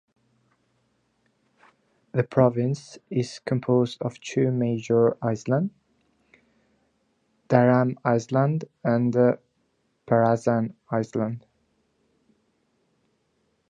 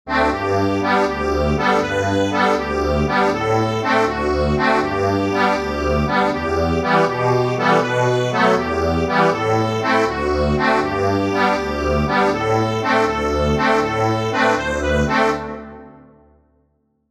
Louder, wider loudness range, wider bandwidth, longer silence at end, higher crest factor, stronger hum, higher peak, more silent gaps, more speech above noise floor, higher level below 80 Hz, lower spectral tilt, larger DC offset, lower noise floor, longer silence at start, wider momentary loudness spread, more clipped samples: second, -24 LUFS vs -18 LUFS; first, 4 LU vs 1 LU; second, 9.4 kHz vs 14 kHz; first, 2.3 s vs 1.2 s; first, 22 dB vs 16 dB; neither; about the same, -2 dBFS vs -2 dBFS; neither; about the same, 48 dB vs 47 dB; second, -66 dBFS vs -32 dBFS; first, -8 dB/octave vs -6 dB/octave; neither; first, -71 dBFS vs -64 dBFS; first, 2.15 s vs 0.05 s; first, 9 LU vs 3 LU; neither